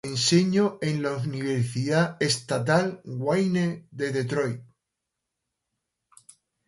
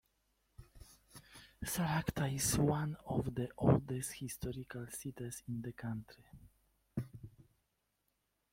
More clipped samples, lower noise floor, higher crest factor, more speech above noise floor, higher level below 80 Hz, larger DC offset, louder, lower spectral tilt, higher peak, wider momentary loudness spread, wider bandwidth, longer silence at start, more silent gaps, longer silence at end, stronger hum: neither; about the same, -84 dBFS vs -83 dBFS; second, 20 dB vs 26 dB; first, 59 dB vs 46 dB; second, -64 dBFS vs -58 dBFS; neither; first, -25 LUFS vs -38 LUFS; about the same, -5 dB/octave vs -5.5 dB/octave; first, -8 dBFS vs -14 dBFS; second, 9 LU vs 25 LU; second, 11.5 kHz vs 16.5 kHz; second, 0.05 s vs 0.6 s; neither; first, 2.05 s vs 1.1 s; neither